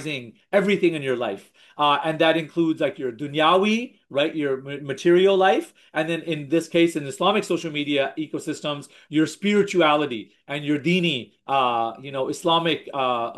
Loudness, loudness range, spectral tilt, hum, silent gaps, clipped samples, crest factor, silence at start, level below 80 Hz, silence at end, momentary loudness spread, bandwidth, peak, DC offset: -22 LUFS; 2 LU; -5 dB/octave; none; none; under 0.1%; 16 dB; 0 s; -74 dBFS; 0 s; 11 LU; 12.5 kHz; -6 dBFS; under 0.1%